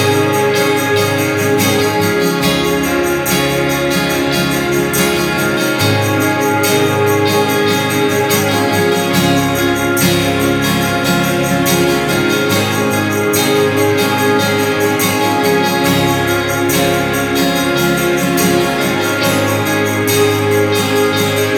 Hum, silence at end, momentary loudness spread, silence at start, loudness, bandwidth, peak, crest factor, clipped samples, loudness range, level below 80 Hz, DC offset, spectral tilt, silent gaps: none; 0 s; 2 LU; 0 s; -13 LUFS; over 20 kHz; 0 dBFS; 12 dB; under 0.1%; 1 LU; -40 dBFS; under 0.1%; -4 dB/octave; none